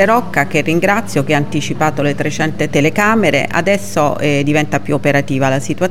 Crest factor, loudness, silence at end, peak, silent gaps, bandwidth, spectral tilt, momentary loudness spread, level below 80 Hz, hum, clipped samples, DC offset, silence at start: 14 dB; -14 LUFS; 0 s; 0 dBFS; none; 16.5 kHz; -5.5 dB/octave; 5 LU; -44 dBFS; none; under 0.1%; 6%; 0 s